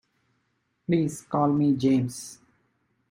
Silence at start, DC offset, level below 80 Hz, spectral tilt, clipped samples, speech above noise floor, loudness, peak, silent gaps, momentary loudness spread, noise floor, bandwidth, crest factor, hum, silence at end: 0.9 s; under 0.1%; -64 dBFS; -7 dB/octave; under 0.1%; 50 dB; -25 LUFS; -10 dBFS; none; 17 LU; -74 dBFS; 15.5 kHz; 18 dB; none; 0.8 s